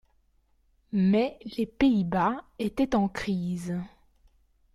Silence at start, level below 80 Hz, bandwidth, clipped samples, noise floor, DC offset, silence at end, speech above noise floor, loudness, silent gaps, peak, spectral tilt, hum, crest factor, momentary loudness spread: 0.95 s; -54 dBFS; 12.5 kHz; under 0.1%; -67 dBFS; under 0.1%; 0.9 s; 40 dB; -28 LUFS; none; -12 dBFS; -7.5 dB/octave; none; 16 dB; 9 LU